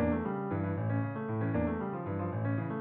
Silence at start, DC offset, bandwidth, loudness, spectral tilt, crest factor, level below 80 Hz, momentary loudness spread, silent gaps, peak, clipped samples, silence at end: 0 s; under 0.1%; 3.9 kHz; -34 LUFS; -9.5 dB/octave; 14 dB; -52 dBFS; 4 LU; none; -18 dBFS; under 0.1%; 0 s